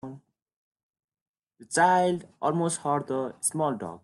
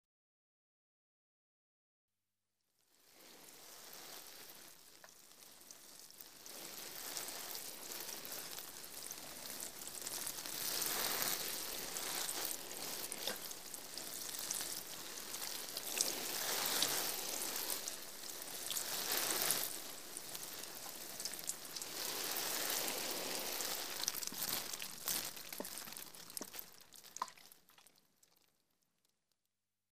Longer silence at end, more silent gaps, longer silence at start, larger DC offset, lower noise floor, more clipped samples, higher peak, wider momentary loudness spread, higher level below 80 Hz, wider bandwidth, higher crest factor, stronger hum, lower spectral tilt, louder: about the same, 0.05 s vs 0 s; second, 0.42-0.46 s, 0.56-0.71 s, 0.83-0.94 s, 1.04-1.08 s, 1.21-1.34 s vs 0.05-2.08 s; about the same, 0.05 s vs 0.05 s; second, under 0.1% vs 0.1%; second, -47 dBFS vs under -90 dBFS; neither; first, -10 dBFS vs -14 dBFS; second, 8 LU vs 18 LU; first, -72 dBFS vs -78 dBFS; second, 12.5 kHz vs 16 kHz; second, 20 dB vs 32 dB; neither; first, -4.5 dB/octave vs 0 dB/octave; first, -26 LUFS vs -41 LUFS